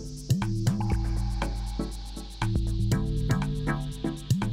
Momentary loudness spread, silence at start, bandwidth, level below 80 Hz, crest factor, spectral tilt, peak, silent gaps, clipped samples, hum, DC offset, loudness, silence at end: 7 LU; 0 s; 15.5 kHz; -32 dBFS; 14 dB; -6.5 dB/octave; -12 dBFS; none; under 0.1%; none; under 0.1%; -30 LUFS; 0 s